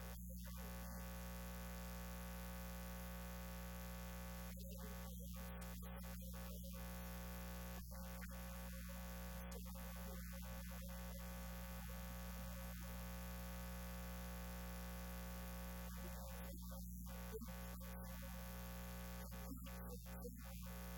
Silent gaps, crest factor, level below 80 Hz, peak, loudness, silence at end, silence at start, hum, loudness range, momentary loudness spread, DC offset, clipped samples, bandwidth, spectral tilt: none; 12 dB; -54 dBFS; -38 dBFS; -52 LUFS; 0 s; 0 s; 60 Hz at -50 dBFS; 1 LU; 1 LU; under 0.1%; under 0.1%; 17.5 kHz; -5 dB/octave